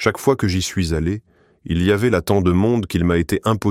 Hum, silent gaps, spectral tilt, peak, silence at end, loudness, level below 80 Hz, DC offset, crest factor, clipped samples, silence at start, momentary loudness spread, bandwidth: none; none; -6 dB/octave; -2 dBFS; 0 s; -19 LUFS; -36 dBFS; under 0.1%; 16 dB; under 0.1%; 0 s; 6 LU; 16 kHz